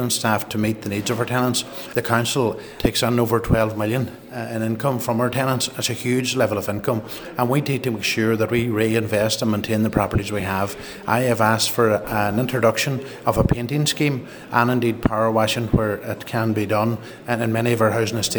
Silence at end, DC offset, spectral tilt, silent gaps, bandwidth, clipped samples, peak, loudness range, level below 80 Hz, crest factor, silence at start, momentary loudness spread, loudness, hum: 0 s; under 0.1%; -5 dB/octave; none; over 20 kHz; under 0.1%; -2 dBFS; 2 LU; -40 dBFS; 20 dB; 0 s; 6 LU; -21 LUFS; none